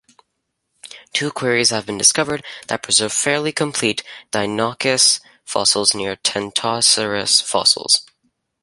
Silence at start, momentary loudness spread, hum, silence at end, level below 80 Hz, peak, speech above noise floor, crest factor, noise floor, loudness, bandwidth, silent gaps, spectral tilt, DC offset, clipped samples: 0.9 s; 10 LU; none; 0.6 s; -58 dBFS; 0 dBFS; 56 dB; 20 dB; -74 dBFS; -17 LUFS; 16 kHz; none; -1.5 dB/octave; under 0.1%; under 0.1%